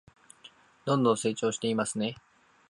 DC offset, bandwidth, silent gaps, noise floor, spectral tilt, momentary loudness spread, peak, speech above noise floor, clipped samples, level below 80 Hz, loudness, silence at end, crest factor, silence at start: under 0.1%; 11.5 kHz; none; -56 dBFS; -5 dB/octave; 11 LU; -12 dBFS; 28 dB; under 0.1%; -72 dBFS; -29 LUFS; 0.55 s; 20 dB; 0.45 s